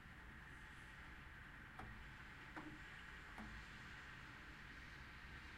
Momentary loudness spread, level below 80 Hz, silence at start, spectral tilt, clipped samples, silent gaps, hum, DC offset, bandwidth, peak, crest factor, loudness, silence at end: 3 LU; -64 dBFS; 0 s; -4.5 dB/octave; under 0.1%; none; none; under 0.1%; 15.5 kHz; -40 dBFS; 16 dB; -56 LUFS; 0 s